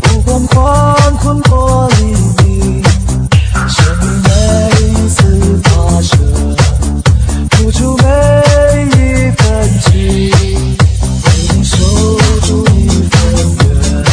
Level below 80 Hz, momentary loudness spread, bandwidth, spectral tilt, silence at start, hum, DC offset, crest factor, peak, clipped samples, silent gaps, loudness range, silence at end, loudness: -14 dBFS; 3 LU; 10.5 kHz; -5.5 dB/octave; 0 s; none; under 0.1%; 8 dB; 0 dBFS; 1%; none; 1 LU; 0 s; -9 LUFS